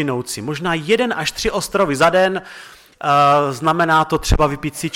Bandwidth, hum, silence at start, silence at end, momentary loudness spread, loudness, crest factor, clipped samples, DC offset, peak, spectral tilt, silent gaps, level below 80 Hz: 17 kHz; none; 0 s; 0 s; 10 LU; -17 LUFS; 16 dB; under 0.1%; under 0.1%; -2 dBFS; -4.5 dB/octave; none; -32 dBFS